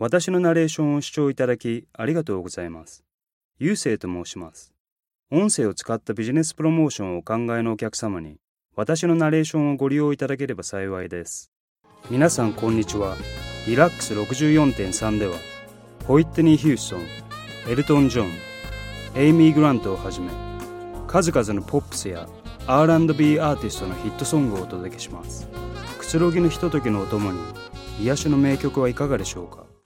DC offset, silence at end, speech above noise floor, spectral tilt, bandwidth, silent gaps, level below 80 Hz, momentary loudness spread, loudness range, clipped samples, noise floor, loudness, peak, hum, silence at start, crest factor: under 0.1%; 0.2 s; 20 dB; -6 dB/octave; 16 kHz; 3.14-3.27 s, 3.33-3.49 s, 4.80-4.85 s, 4.92-4.96 s, 5.19-5.23 s, 8.44-8.55 s, 8.65-8.69 s, 11.48-11.76 s; -44 dBFS; 17 LU; 5 LU; under 0.1%; -41 dBFS; -22 LUFS; 0 dBFS; none; 0 s; 22 dB